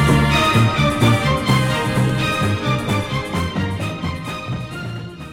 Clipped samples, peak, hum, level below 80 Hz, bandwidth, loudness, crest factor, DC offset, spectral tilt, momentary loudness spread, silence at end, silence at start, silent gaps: under 0.1%; -4 dBFS; none; -34 dBFS; 16.5 kHz; -18 LUFS; 14 dB; under 0.1%; -5.5 dB/octave; 12 LU; 0 s; 0 s; none